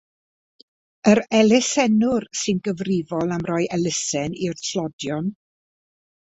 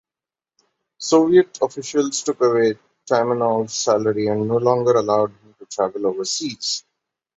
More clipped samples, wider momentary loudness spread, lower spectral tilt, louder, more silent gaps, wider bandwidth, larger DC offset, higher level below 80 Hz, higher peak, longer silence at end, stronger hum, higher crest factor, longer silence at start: neither; about the same, 10 LU vs 8 LU; about the same, -4.5 dB/octave vs -4.5 dB/octave; about the same, -21 LUFS vs -19 LUFS; first, 4.93-4.99 s vs none; about the same, 8.4 kHz vs 8.2 kHz; neither; about the same, -58 dBFS vs -62 dBFS; about the same, -2 dBFS vs -2 dBFS; first, 0.9 s vs 0.6 s; neither; about the same, 20 dB vs 18 dB; about the same, 1.05 s vs 1 s